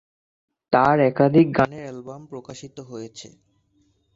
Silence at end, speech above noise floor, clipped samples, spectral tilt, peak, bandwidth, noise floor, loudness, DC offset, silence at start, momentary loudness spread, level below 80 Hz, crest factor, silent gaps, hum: 0.9 s; 44 dB; under 0.1%; -7.5 dB/octave; -4 dBFS; 7.8 kHz; -65 dBFS; -18 LUFS; under 0.1%; 0.7 s; 22 LU; -56 dBFS; 20 dB; none; none